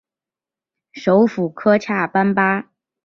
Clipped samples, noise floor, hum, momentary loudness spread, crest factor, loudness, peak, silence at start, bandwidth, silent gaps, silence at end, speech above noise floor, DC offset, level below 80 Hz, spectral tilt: under 0.1%; -89 dBFS; none; 5 LU; 16 dB; -17 LUFS; -2 dBFS; 0.95 s; 6.8 kHz; none; 0.45 s; 73 dB; under 0.1%; -62 dBFS; -7.5 dB/octave